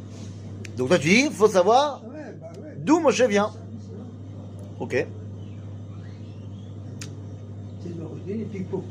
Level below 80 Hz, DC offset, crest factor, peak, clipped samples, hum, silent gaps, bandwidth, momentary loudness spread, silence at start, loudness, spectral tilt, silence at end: -64 dBFS; under 0.1%; 20 dB; -4 dBFS; under 0.1%; none; none; 15.5 kHz; 20 LU; 0 s; -22 LUFS; -5 dB/octave; 0 s